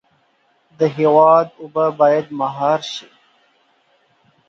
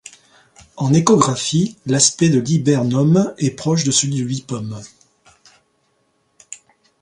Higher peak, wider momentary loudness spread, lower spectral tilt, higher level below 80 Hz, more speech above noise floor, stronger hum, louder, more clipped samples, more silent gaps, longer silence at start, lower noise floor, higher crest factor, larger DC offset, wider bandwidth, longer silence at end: about the same, 0 dBFS vs 0 dBFS; second, 12 LU vs 19 LU; about the same, -6 dB/octave vs -5 dB/octave; second, -70 dBFS vs -56 dBFS; about the same, 45 dB vs 48 dB; neither; about the same, -16 LUFS vs -16 LUFS; neither; neither; about the same, 0.8 s vs 0.75 s; about the same, -61 dBFS vs -64 dBFS; about the same, 18 dB vs 18 dB; neither; second, 7.4 kHz vs 11.5 kHz; first, 1.5 s vs 0.45 s